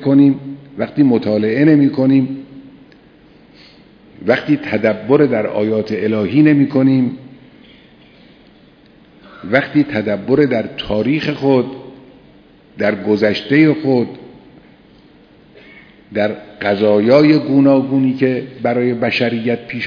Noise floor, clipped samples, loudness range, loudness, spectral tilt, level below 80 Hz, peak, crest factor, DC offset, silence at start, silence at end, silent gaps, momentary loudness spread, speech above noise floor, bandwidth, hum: -46 dBFS; under 0.1%; 5 LU; -15 LUFS; -8.5 dB/octave; -52 dBFS; 0 dBFS; 16 dB; under 0.1%; 0 s; 0 s; none; 11 LU; 32 dB; 5.4 kHz; none